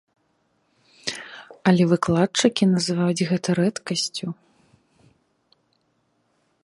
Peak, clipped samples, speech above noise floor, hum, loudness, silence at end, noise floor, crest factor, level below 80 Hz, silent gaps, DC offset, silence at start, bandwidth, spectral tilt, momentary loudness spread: -2 dBFS; under 0.1%; 48 dB; none; -22 LUFS; 2.3 s; -69 dBFS; 22 dB; -62 dBFS; none; under 0.1%; 1.05 s; 11.5 kHz; -5 dB/octave; 14 LU